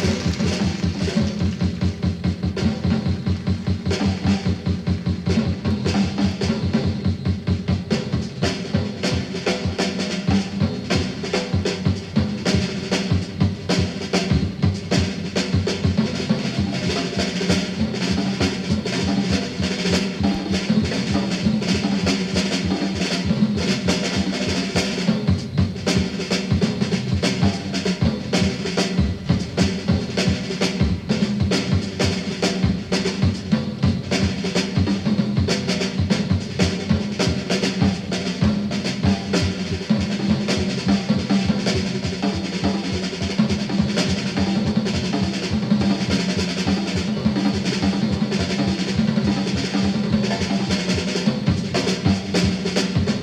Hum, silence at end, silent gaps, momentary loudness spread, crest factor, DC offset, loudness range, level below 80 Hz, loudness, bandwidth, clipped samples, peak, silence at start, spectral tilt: none; 0 s; none; 3 LU; 14 dB; under 0.1%; 1 LU; -38 dBFS; -21 LUFS; 11.5 kHz; under 0.1%; -6 dBFS; 0 s; -5.5 dB/octave